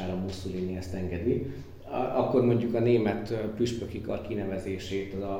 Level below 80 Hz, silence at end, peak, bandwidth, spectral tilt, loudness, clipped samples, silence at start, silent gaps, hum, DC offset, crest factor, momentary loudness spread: -52 dBFS; 0 s; -12 dBFS; 15.5 kHz; -7.5 dB/octave; -30 LUFS; under 0.1%; 0 s; none; none; under 0.1%; 18 dB; 10 LU